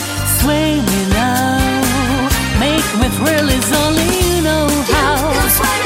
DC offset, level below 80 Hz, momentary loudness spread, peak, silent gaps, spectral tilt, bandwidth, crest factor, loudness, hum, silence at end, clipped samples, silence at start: under 0.1%; -24 dBFS; 2 LU; 0 dBFS; none; -4 dB/octave; 16.5 kHz; 14 dB; -14 LUFS; none; 0 s; under 0.1%; 0 s